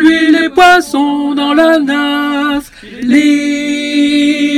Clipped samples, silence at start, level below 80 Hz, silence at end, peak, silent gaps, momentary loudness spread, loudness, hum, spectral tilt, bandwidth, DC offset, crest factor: 2%; 0 s; -44 dBFS; 0 s; 0 dBFS; none; 8 LU; -10 LUFS; none; -3 dB/octave; 13.5 kHz; under 0.1%; 10 dB